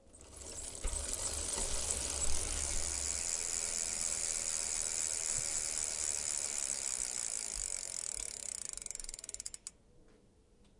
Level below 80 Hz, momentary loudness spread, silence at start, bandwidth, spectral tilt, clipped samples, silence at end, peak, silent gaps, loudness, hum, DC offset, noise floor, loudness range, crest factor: -48 dBFS; 10 LU; 0.1 s; 11.5 kHz; -0.5 dB/octave; under 0.1%; 0.65 s; -16 dBFS; none; -35 LUFS; none; under 0.1%; -65 dBFS; 5 LU; 22 dB